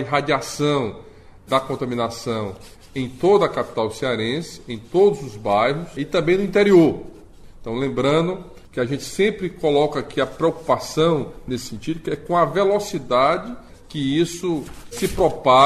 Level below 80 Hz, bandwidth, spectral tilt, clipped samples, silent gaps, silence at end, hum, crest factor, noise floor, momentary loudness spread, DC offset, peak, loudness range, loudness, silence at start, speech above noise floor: -46 dBFS; 14.5 kHz; -5.5 dB/octave; under 0.1%; none; 0 s; none; 18 dB; -41 dBFS; 12 LU; under 0.1%; -4 dBFS; 4 LU; -21 LUFS; 0 s; 21 dB